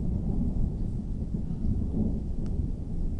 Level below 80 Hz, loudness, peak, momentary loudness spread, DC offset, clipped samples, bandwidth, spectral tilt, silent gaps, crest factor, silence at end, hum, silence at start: -32 dBFS; -32 LUFS; -14 dBFS; 4 LU; under 0.1%; under 0.1%; 1.9 kHz; -11 dB/octave; none; 14 dB; 0 s; none; 0 s